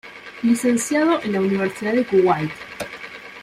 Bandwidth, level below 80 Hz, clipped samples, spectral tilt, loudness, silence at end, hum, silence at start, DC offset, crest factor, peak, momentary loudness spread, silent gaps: 15.5 kHz; -58 dBFS; under 0.1%; -5 dB/octave; -20 LUFS; 0 s; none; 0.05 s; under 0.1%; 14 dB; -6 dBFS; 14 LU; none